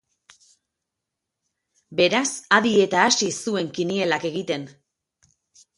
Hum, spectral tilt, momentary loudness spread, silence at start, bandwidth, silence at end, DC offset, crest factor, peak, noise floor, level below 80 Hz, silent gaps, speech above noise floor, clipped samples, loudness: none; -3 dB/octave; 11 LU; 1.9 s; 11.5 kHz; 1.1 s; under 0.1%; 22 dB; -2 dBFS; -83 dBFS; -68 dBFS; none; 62 dB; under 0.1%; -21 LUFS